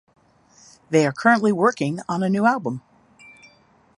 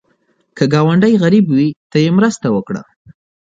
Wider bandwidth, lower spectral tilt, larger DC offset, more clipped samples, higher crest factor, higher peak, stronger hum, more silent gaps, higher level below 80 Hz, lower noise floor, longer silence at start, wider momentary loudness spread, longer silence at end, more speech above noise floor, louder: first, 11.5 kHz vs 8.6 kHz; about the same, -6 dB/octave vs -7 dB/octave; neither; neither; first, 20 dB vs 14 dB; about the same, -2 dBFS vs 0 dBFS; neither; second, none vs 1.76-1.90 s; second, -66 dBFS vs -54 dBFS; second, -56 dBFS vs -60 dBFS; first, 0.9 s vs 0.55 s; about the same, 9 LU vs 8 LU; first, 1.2 s vs 0.75 s; second, 36 dB vs 48 dB; second, -20 LUFS vs -13 LUFS